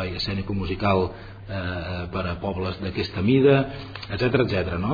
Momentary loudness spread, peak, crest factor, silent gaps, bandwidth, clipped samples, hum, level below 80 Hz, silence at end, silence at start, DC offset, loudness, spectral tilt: 12 LU; -6 dBFS; 18 dB; none; 5 kHz; under 0.1%; none; -42 dBFS; 0 s; 0 s; under 0.1%; -24 LUFS; -8 dB/octave